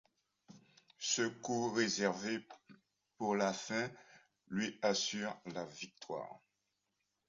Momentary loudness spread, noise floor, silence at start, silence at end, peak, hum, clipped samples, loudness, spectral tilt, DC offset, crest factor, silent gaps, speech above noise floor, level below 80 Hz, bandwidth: 11 LU; -85 dBFS; 0.5 s; 0.9 s; -18 dBFS; none; under 0.1%; -38 LUFS; -3 dB/octave; under 0.1%; 22 dB; none; 47 dB; -80 dBFS; 7.4 kHz